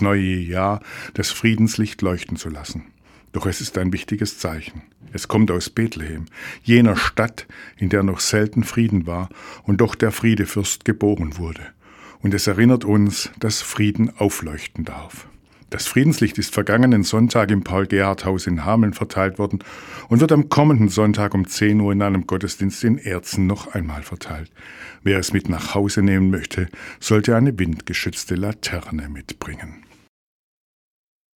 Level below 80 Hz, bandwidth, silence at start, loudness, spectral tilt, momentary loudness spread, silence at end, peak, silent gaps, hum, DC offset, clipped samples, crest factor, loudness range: -42 dBFS; 18 kHz; 0 s; -20 LUFS; -5.5 dB/octave; 16 LU; 1.6 s; 0 dBFS; none; none; under 0.1%; under 0.1%; 20 dB; 6 LU